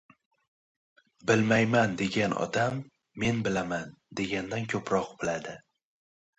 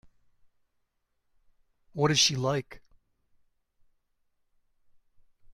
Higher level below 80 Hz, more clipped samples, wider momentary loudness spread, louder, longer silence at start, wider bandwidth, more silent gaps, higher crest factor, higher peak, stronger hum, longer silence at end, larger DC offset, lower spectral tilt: about the same, -60 dBFS vs -64 dBFS; neither; about the same, 14 LU vs 12 LU; second, -29 LUFS vs -26 LUFS; second, 1.25 s vs 1.95 s; second, 8.2 kHz vs 14 kHz; neither; second, 20 dB vs 26 dB; about the same, -10 dBFS vs -10 dBFS; neither; second, 0.8 s vs 2.75 s; neither; first, -5.5 dB/octave vs -3 dB/octave